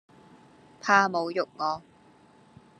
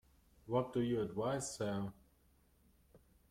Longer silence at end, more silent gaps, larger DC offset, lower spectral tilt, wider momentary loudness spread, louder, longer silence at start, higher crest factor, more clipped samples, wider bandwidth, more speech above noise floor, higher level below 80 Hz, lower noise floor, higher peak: first, 1 s vs 0.35 s; neither; neither; second, -4 dB/octave vs -5.5 dB/octave; first, 13 LU vs 5 LU; first, -26 LUFS vs -39 LUFS; first, 0.85 s vs 0.45 s; first, 24 dB vs 18 dB; neither; second, 10.5 kHz vs 16.5 kHz; about the same, 32 dB vs 33 dB; second, -76 dBFS vs -68 dBFS; second, -57 dBFS vs -71 dBFS; first, -6 dBFS vs -22 dBFS